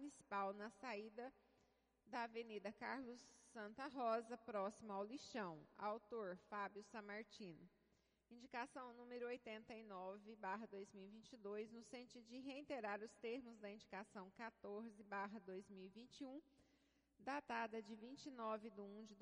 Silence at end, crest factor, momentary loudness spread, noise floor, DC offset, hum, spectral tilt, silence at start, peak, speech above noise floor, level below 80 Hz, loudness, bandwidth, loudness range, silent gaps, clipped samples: 0 s; 20 dB; 11 LU; -82 dBFS; under 0.1%; none; -5 dB/octave; 0 s; -32 dBFS; 30 dB; -88 dBFS; -53 LUFS; 10 kHz; 5 LU; none; under 0.1%